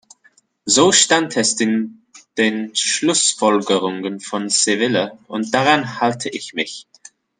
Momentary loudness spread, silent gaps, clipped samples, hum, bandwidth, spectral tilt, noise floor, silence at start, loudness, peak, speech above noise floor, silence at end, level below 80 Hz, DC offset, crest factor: 13 LU; none; under 0.1%; none; 10.5 kHz; -2 dB/octave; -57 dBFS; 0.65 s; -17 LUFS; 0 dBFS; 39 dB; 0.6 s; -62 dBFS; under 0.1%; 18 dB